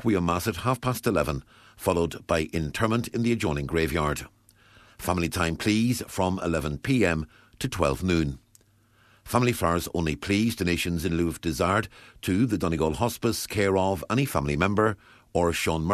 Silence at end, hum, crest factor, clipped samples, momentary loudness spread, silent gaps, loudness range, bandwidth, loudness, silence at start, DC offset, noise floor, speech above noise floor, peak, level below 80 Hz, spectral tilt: 0 s; none; 20 dB; under 0.1%; 7 LU; none; 2 LU; 14 kHz; -26 LUFS; 0 s; under 0.1%; -61 dBFS; 36 dB; -6 dBFS; -44 dBFS; -5.5 dB/octave